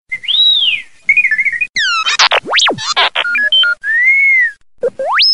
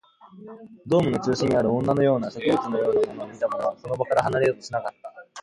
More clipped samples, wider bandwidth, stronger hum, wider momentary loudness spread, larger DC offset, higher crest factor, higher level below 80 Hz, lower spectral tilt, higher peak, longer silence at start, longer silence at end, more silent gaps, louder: neither; about the same, 11.5 kHz vs 11.5 kHz; neither; second, 7 LU vs 20 LU; first, 0.8% vs under 0.1%; second, 12 dB vs 18 dB; about the same, -58 dBFS vs -58 dBFS; second, 0.5 dB/octave vs -6.5 dB/octave; first, 0 dBFS vs -6 dBFS; second, 0.1 s vs 0.25 s; about the same, 0 s vs 0 s; first, 1.69-1.73 s vs none; first, -10 LUFS vs -24 LUFS